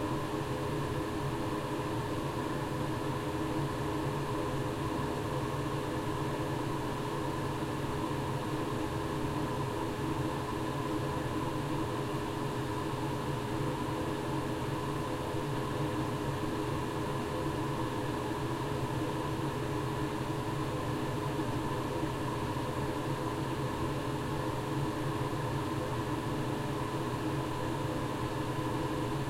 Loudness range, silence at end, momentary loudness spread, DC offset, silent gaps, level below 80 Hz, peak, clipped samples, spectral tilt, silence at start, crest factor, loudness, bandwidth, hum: 0 LU; 0 s; 1 LU; under 0.1%; none; -50 dBFS; -20 dBFS; under 0.1%; -6 dB/octave; 0 s; 14 dB; -35 LUFS; 16.5 kHz; none